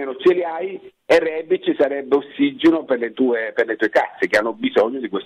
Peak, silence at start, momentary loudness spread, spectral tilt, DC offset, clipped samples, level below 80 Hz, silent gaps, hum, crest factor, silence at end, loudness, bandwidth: -4 dBFS; 0 s; 5 LU; -5 dB/octave; under 0.1%; under 0.1%; -60 dBFS; none; none; 16 dB; 0 s; -19 LUFS; 11.5 kHz